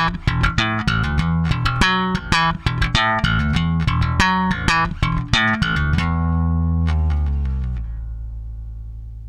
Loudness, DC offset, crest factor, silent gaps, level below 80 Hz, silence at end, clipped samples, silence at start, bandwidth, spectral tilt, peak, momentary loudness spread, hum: -19 LUFS; under 0.1%; 18 dB; none; -26 dBFS; 0 s; under 0.1%; 0 s; 11.5 kHz; -5.5 dB/octave; 0 dBFS; 14 LU; none